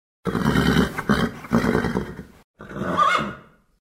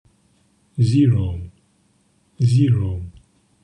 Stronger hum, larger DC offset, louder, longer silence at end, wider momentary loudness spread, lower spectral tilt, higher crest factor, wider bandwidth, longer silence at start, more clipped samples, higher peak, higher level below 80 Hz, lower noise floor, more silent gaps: neither; neither; second, -22 LUFS vs -19 LUFS; second, 0.4 s vs 0.55 s; about the same, 16 LU vs 17 LU; second, -6 dB/octave vs -8.5 dB/octave; first, 20 dB vs 14 dB; first, 16 kHz vs 9.8 kHz; second, 0.25 s vs 0.75 s; neither; about the same, -4 dBFS vs -6 dBFS; first, -38 dBFS vs -46 dBFS; second, -43 dBFS vs -61 dBFS; first, 2.44-2.54 s vs none